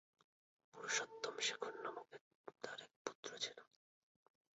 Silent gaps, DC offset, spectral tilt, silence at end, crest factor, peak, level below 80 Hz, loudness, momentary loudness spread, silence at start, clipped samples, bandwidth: 2.21-2.44 s, 2.96-3.05 s, 3.15-3.23 s; under 0.1%; 1 dB/octave; 0.95 s; 24 dB; -26 dBFS; under -90 dBFS; -46 LUFS; 19 LU; 0.75 s; under 0.1%; 7.6 kHz